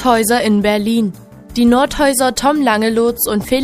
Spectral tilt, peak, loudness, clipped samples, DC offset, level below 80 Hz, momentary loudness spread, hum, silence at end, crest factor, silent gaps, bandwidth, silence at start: -4 dB/octave; 0 dBFS; -14 LUFS; under 0.1%; under 0.1%; -38 dBFS; 5 LU; none; 0 s; 14 dB; none; 15.5 kHz; 0 s